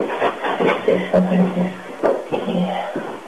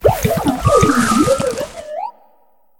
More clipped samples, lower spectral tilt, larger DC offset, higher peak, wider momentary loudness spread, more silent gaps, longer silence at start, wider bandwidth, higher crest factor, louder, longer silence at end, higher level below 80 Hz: neither; first, -7.5 dB/octave vs -5.5 dB/octave; first, 0.4% vs under 0.1%; second, -6 dBFS vs 0 dBFS; second, 7 LU vs 15 LU; neither; about the same, 0 s vs 0 s; second, 11.5 kHz vs 19 kHz; about the same, 14 dB vs 16 dB; second, -20 LUFS vs -15 LUFS; second, 0 s vs 0.7 s; second, -58 dBFS vs -34 dBFS